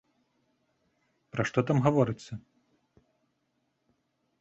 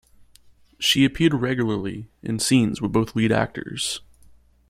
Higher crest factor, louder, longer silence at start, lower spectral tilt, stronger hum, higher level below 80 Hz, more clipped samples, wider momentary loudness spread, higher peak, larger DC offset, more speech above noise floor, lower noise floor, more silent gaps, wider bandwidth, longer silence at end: first, 24 dB vs 18 dB; second, -28 LUFS vs -22 LUFS; first, 1.35 s vs 0.8 s; first, -7.5 dB/octave vs -4.5 dB/octave; neither; second, -64 dBFS vs -50 dBFS; neither; first, 18 LU vs 11 LU; second, -10 dBFS vs -4 dBFS; neither; first, 50 dB vs 32 dB; first, -77 dBFS vs -53 dBFS; neither; second, 8 kHz vs 15.5 kHz; first, 2 s vs 0.7 s